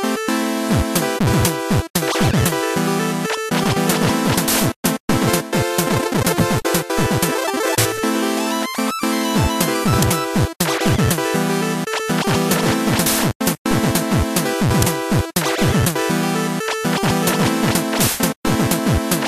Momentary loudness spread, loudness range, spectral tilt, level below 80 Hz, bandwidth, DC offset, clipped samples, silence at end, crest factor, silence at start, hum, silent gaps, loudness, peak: 3 LU; 1 LU; -4.5 dB/octave; -36 dBFS; 15 kHz; under 0.1%; under 0.1%; 0 s; 16 dB; 0 s; none; 1.90-1.94 s, 4.76-4.83 s, 5.00-5.08 s, 13.35-13.40 s, 13.58-13.65 s, 18.36-18.43 s; -18 LUFS; -2 dBFS